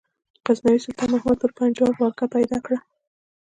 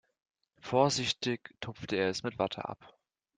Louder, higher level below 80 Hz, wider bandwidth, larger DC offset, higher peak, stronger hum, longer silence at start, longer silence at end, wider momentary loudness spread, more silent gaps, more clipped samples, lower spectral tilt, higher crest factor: first, -22 LUFS vs -32 LUFS; first, -54 dBFS vs -68 dBFS; about the same, 9.2 kHz vs 9.6 kHz; neither; first, -6 dBFS vs -12 dBFS; neither; second, 0.45 s vs 0.65 s; about the same, 0.6 s vs 0.5 s; second, 7 LU vs 15 LU; neither; neither; first, -6 dB/octave vs -4 dB/octave; second, 16 dB vs 22 dB